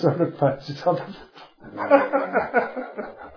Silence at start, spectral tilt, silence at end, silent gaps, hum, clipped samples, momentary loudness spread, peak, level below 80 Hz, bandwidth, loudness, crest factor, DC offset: 0 s; -8.5 dB/octave; 0 s; none; none; under 0.1%; 18 LU; -2 dBFS; -60 dBFS; 5.4 kHz; -23 LUFS; 22 dB; under 0.1%